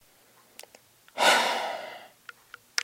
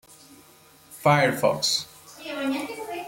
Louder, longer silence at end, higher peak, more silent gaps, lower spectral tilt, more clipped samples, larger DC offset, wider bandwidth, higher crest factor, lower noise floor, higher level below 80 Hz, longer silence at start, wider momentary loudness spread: about the same, -25 LUFS vs -24 LUFS; about the same, 0 s vs 0 s; about the same, -6 dBFS vs -8 dBFS; neither; second, 0 dB/octave vs -4 dB/octave; neither; neither; about the same, 16.5 kHz vs 16.5 kHz; first, 24 dB vs 18 dB; first, -60 dBFS vs -54 dBFS; second, -80 dBFS vs -64 dBFS; first, 1.15 s vs 0.1 s; first, 25 LU vs 16 LU